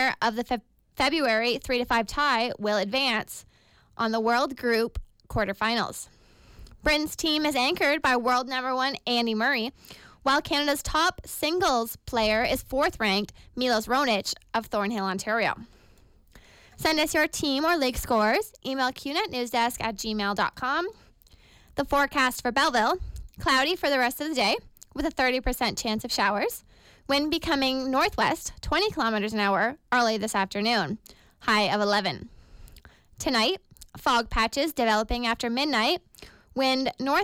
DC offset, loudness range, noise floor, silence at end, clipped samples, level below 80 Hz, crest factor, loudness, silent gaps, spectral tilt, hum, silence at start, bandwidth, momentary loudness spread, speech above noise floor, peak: under 0.1%; 3 LU; -56 dBFS; 0 s; under 0.1%; -46 dBFS; 14 dB; -26 LUFS; none; -3 dB/octave; none; 0 s; 17 kHz; 8 LU; 31 dB; -12 dBFS